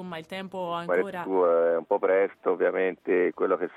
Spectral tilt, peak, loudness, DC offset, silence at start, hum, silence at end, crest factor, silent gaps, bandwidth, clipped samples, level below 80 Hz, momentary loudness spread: -7 dB/octave; -12 dBFS; -26 LUFS; under 0.1%; 0 s; none; 0.1 s; 14 dB; none; 9.8 kHz; under 0.1%; -74 dBFS; 10 LU